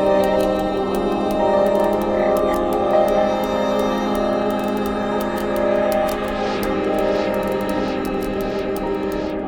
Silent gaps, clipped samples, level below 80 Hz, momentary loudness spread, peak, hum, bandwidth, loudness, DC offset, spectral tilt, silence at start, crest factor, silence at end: none; under 0.1%; -38 dBFS; 6 LU; -6 dBFS; none; 18 kHz; -20 LUFS; under 0.1%; -6 dB/octave; 0 s; 14 dB; 0 s